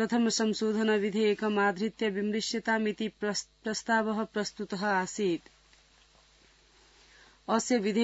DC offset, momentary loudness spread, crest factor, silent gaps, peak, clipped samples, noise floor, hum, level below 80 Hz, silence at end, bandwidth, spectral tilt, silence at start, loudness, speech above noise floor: under 0.1%; 7 LU; 18 dB; none; -12 dBFS; under 0.1%; -62 dBFS; none; -68 dBFS; 0 s; 8 kHz; -4 dB/octave; 0 s; -30 LUFS; 33 dB